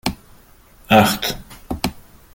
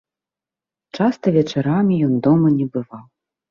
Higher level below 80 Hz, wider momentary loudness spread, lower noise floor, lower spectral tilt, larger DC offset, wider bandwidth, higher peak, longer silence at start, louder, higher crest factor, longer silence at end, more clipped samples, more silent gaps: first, -40 dBFS vs -58 dBFS; first, 16 LU vs 12 LU; second, -48 dBFS vs -89 dBFS; second, -4.5 dB/octave vs -8.5 dB/octave; neither; first, 17 kHz vs 7 kHz; first, 0 dBFS vs -4 dBFS; second, 0.05 s vs 0.95 s; about the same, -18 LUFS vs -18 LUFS; about the same, 20 dB vs 16 dB; second, 0.35 s vs 0.5 s; neither; neither